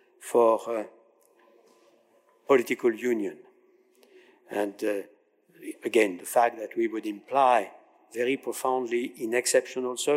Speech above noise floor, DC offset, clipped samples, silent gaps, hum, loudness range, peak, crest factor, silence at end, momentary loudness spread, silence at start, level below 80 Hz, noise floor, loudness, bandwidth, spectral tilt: 38 dB; under 0.1%; under 0.1%; none; none; 4 LU; -10 dBFS; 18 dB; 0 s; 13 LU; 0.2 s; -90 dBFS; -64 dBFS; -27 LUFS; 16 kHz; -3 dB/octave